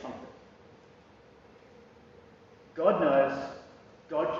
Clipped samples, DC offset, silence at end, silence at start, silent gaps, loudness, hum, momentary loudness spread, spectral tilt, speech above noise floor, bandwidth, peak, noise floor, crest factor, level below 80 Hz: under 0.1%; under 0.1%; 0 s; 0 s; none; -28 LUFS; none; 23 LU; -4.5 dB/octave; 30 dB; 7.2 kHz; -10 dBFS; -57 dBFS; 22 dB; -68 dBFS